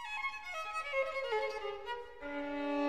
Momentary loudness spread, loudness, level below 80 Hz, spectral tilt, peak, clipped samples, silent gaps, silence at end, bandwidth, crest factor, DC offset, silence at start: 8 LU; -38 LUFS; -66 dBFS; -3 dB/octave; -22 dBFS; under 0.1%; none; 0 s; 14.5 kHz; 16 dB; 0.2%; 0 s